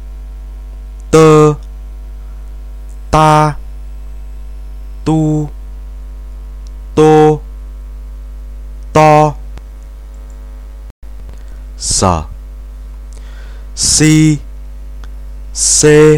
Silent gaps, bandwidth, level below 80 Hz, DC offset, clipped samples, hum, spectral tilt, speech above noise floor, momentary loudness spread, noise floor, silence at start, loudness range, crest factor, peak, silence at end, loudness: 10.91-11.02 s; 15 kHz; -26 dBFS; under 0.1%; 2%; none; -4.5 dB/octave; 21 dB; 25 LU; -28 dBFS; 0 s; 8 LU; 14 dB; 0 dBFS; 0 s; -10 LUFS